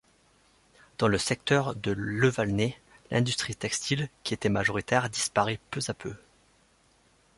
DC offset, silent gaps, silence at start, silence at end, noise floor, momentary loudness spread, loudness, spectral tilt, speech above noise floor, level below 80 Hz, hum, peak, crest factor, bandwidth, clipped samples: under 0.1%; none; 1 s; 1.2 s; -64 dBFS; 8 LU; -28 LUFS; -4.5 dB/octave; 36 dB; -56 dBFS; none; -8 dBFS; 22 dB; 11.5 kHz; under 0.1%